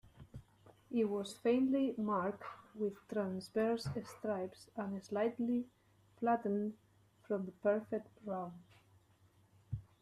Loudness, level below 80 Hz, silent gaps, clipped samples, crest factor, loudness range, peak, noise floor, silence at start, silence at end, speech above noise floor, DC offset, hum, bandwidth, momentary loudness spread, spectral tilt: -39 LUFS; -70 dBFS; none; under 0.1%; 18 dB; 3 LU; -20 dBFS; -69 dBFS; 0.15 s; 0.2 s; 32 dB; under 0.1%; none; 13.5 kHz; 15 LU; -7 dB/octave